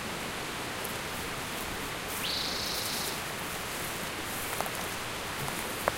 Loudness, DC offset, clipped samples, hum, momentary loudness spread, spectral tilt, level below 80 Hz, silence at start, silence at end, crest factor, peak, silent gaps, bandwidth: -33 LUFS; under 0.1%; under 0.1%; none; 4 LU; -2 dB/octave; -52 dBFS; 0 s; 0 s; 28 dB; -6 dBFS; none; 17 kHz